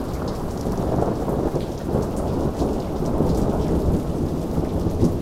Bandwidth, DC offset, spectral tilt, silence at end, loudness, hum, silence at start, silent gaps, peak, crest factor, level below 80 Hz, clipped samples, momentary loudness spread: 16.5 kHz; under 0.1%; -8 dB/octave; 0 s; -24 LUFS; none; 0 s; none; -6 dBFS; 16 dB; -30 dBFS; under 0.1%; 5 LU